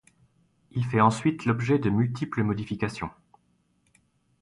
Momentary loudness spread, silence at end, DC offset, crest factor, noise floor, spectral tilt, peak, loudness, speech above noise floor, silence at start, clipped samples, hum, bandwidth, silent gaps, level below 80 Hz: 11 LU; 1.3 s; under 0.1%; 20 dB; -69 dBFS; -7.5 dB/octave; -8 dBFS; -26 LUFS; 44 dB; 0.75 s; under 0.1%; none; 11.5 kHz; none; -56 dBFS